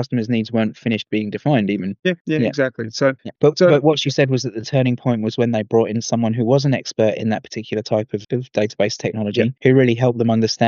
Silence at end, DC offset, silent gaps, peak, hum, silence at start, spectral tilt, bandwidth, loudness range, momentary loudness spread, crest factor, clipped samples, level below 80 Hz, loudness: 0 s; under 0.1%; 2.21-2.25 s; -2 dBFS; none; 0 s; -6 dB/octave; 7.4 kHz; 3 LU; 8 LU; 16 dB; under 0.1%; -62 dBFS; -19 LUFS